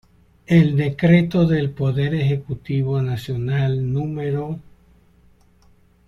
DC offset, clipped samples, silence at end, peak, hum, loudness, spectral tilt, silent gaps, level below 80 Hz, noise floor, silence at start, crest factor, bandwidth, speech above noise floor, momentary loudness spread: under 0.1%; under 0.1%; 1.45 s; -4 dBFS; none; -20 LUFS; -9 dB/octave; none; -48 dBFS; -54 dBFS; 0.5 s; 18 dB; 11.5 kHz; 35 dB; 10 LU